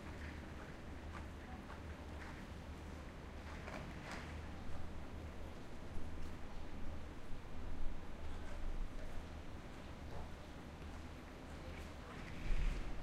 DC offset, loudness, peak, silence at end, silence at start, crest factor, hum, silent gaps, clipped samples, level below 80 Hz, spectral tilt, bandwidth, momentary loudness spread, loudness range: under 0.1%; -51 LUFS; -26 dBFS; 0 s; 0 s; 18 dB; none; none; under 0.1%; -48 dBFS; -6 dB/octave; 11.5 kHz; 4 LU; 1 LU